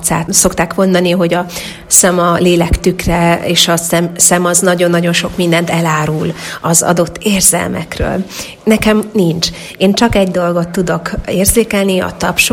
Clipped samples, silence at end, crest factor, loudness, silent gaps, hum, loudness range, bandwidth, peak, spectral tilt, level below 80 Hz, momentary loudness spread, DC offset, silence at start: 0.2%; 0 s; 12 dB; -11 LUFS; none; none; 3 LU; over 20 kHz; 0 dBFS; -3.5 dB/octave; -28 dBFS; 8 LU; under 0.1%; 0 s